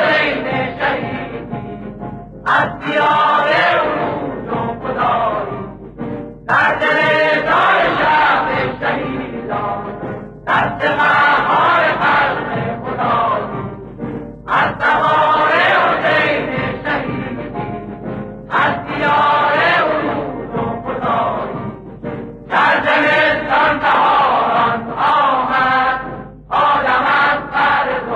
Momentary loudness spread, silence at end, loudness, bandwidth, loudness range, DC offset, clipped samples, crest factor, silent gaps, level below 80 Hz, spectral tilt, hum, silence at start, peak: 14 LU; 0 s; -15 LUFS; 10.5 kHz; 4 LU; under 0.1%; under 0.1%; 12 dB; none; -44 dBFS; -6 dB/octave; none; 0 s; -2 dBFS